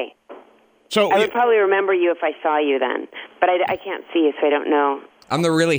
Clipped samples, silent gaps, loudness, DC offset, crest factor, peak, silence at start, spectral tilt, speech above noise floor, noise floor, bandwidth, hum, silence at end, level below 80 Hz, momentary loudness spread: under 0.1%; none; -19 LUFS; under 0.1%; 16 dB; -2 dBFS; 0 s; -5 dB/octave; 33 dB; -52 dBFS; over 20 kHz; none; 0 s; -66 dBFS; 9 LU